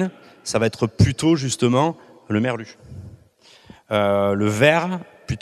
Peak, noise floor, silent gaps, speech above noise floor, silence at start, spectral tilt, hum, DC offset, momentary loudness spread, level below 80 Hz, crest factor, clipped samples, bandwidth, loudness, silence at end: 0 dBFS; -52 dBFS; none; 32 dB; 0 s; -5.5 dB/octave; none; under 0.1%; 20 LU; -46 dBFS; 22 dB; under 0.1%; 14 kHz; -20 LUFS; 0.05 s